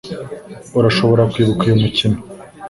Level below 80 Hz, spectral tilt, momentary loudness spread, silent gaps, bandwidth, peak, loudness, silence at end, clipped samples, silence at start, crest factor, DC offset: -42 dBFS; -7 dB/octave; 17 LU; none; 11.5 kHz; 0 dBFS; -15 LUFS; 0 s; under 0.1%; 0.05 s; 16 dB; under 0.1%